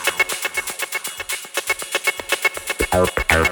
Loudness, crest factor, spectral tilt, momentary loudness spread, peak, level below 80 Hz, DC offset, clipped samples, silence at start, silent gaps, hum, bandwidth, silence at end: -20 LUFS; 22 dB; -2.5 dB/octave; 7 LU; 0 dBFS; -36 dBFS; under 0.1%; under 0.1%; 0 s; none; none; over 20 kHz; 0 s